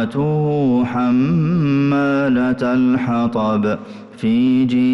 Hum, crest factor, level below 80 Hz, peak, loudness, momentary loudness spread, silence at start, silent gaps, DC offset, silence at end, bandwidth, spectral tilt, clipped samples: none; 8 dB; -50 dBFS; -8 dBFS; -17 LUFS; 4 LU; 0 s; none; under 0.1%; 0 s; 6.2 kHz; -9 dB/octave; under 0.1%